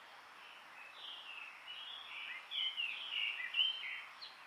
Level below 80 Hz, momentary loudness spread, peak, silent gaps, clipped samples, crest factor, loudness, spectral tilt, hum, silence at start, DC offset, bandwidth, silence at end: under -90 dBFS; 20 LU; -22 dBFS; none; under 0.1%; 22 dB; -40 LUFS; 1.5 dB/octave; none; 0 s; under 0.1%; 16 kHz; 0 s